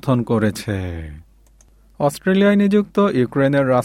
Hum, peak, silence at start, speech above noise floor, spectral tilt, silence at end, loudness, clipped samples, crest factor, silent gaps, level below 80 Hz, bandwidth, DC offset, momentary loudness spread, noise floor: none; -4 dBFS; 0.05 s; 34 dB; -7 dB/octave; 0 s; -18 LUFS; under 0.1%; 14 dB; none; -46 dBFS; 15.5 kHz; under 0.1%; 12 LU; -51 dBFS